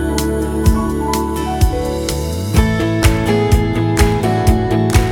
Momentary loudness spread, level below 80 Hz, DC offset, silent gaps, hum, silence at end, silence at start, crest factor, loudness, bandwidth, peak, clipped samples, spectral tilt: 5 LU; -20 dBFS; under 0.1%; none; none; 0 s; 0 s; 14 dB; -16 LUFS; 18 kHz; 0 dBFS; under 0.1%; -6 dB/octave